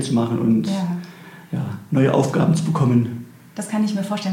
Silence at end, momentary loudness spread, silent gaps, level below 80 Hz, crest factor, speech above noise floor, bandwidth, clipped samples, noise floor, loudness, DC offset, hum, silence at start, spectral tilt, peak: 0 s; 15 LU; none; -58 dBFS; 16 dB; 21 dB; 16 kHz; under 0.1%; -40 dBFS; -20 LUFS; under 0.1%; none; 0 s; -7 dB/octave; -4 dBFS